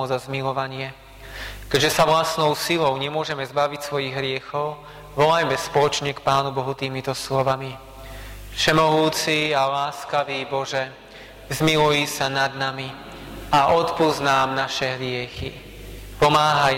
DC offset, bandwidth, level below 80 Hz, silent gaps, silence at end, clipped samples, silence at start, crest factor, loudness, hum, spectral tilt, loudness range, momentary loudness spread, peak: under 0.1%; 16.5 kHz; -46 dBFS; none; 0 s; under 0.1%; 0 s; 14 dB; -21 LUFS; none; -4 dB/octave; 2 LU; 19 LU; -8 dBFS